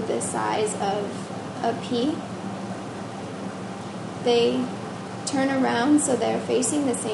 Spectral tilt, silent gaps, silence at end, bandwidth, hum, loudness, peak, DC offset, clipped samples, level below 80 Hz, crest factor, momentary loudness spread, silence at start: -4 dB/octave; none; 0 s; 11.5 kHz; none; -25 LUFS; -8 dBFS; under 0.1%; under 0.1%; -62 dBFS; 16 dB; 13 LU; 0 s